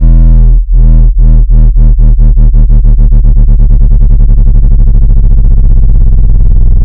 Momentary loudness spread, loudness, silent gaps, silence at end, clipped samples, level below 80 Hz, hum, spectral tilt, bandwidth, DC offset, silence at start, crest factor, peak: 2 LU; -8 LUFS; none; 0 s; 30%; -2 dBFS; none; -12.5 dB/octave; 1.1 kHz; under 0.1%; 0 s; 2 dB; 0 dBFS